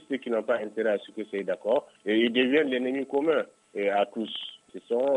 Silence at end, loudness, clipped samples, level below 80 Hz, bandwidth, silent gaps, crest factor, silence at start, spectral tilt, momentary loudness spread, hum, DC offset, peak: 0 s; -28 LUFS; under 0.1%; -84 dBFS; 10.5 kHz; none; 16 dB; 0.1 s; -5.5 dB/octave; 11 LU; none; under 0.1%; -12 dBFS